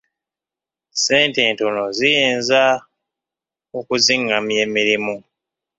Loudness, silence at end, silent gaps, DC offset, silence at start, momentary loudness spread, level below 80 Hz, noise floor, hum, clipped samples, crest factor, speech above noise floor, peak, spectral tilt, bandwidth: -16 LUFS; 0.6 s; none; under 0.1%; 0.95 s; 12 LU; -64 dBFS; -88 dBFS; none; under 0.1%; 18 dB; 71 dB; -2 dBFS; -2 dB/octave; 8 kHz